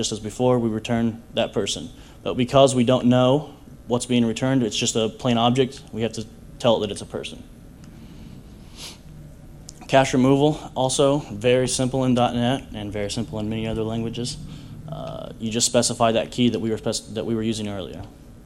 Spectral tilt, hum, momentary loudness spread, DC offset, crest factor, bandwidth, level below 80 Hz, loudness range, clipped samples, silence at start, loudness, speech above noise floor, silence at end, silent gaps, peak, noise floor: -5 dB/octave; none; 20 LU; under 0.1%; 22 dB; 15.5 kHz; -46 dBFS; 8 LU; under 0.1%; 0 s; -22 LUFS; 21 dB; 0 s; none; -2 dBFS; -43 dBFS